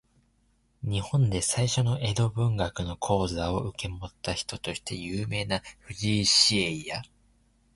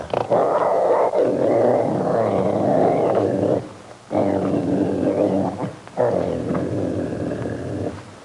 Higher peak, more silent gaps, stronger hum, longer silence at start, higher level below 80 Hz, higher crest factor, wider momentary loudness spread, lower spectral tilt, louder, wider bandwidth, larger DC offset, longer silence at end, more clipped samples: about the same, -6 dBFS vs -6 dBFS; neither; neither; first, 0.8 s vs 0 s; first, -46 dBFS vs -56 dBFS; first, 22 dB vs 14 dB; first, 14 LU vs 9 LU; second, -4 dB/octave vs -8 dB/octave; second, -27 LUFS vs -21 LUFS; about the same, 11.5 kHz vs 11.5 kHz; neither; first, 0.7 s vs 0 s; neither